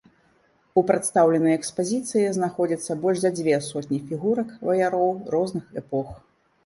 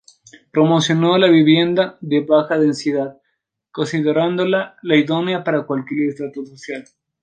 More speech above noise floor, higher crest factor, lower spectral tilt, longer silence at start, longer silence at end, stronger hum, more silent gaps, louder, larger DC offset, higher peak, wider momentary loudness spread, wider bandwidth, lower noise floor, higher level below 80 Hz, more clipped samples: second, 39 dB vs 55 dB; about the same, 18 dB vs 16 dB; about the same, -5.5 dB/octave vs -6 dB/octave; first, 0.75 s vs 0.55 s; about the same, 0.5 s vs 0.4 s; neither; neither; second, -24 LUFS vs -17 LUFS; neither; about the same, -4 dBFS vs -2 dBFS; second, 10 LU vs 16 LU; first, 11.5 kHz vs 9.2 kHz; second, -62 dBFS vs -72 dBFS; first, -60 dBFS vs -66 dBFS; neither